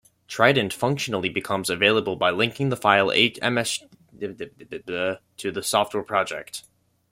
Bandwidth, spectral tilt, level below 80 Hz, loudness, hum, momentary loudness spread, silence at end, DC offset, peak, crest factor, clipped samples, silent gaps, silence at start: 16.5 kHz; -3.5 dB/octave; -62 dBFS; -22 LUFS; none; 16 LU; 0.5 s; under 0.1%; -2 dBFS; 22 dB; under 0.1%; none; 0.3 s